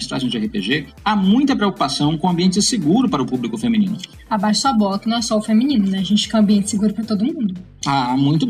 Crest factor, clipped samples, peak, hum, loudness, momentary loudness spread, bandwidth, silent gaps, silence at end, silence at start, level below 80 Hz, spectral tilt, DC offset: 12 dB; under 0.1%; -6 dBFS; none; -18 LUFS; 6 LU; 12.5 kHz; none; 0 s; 0 s; -48 dBFS; -5 dB/octave; under 0.1%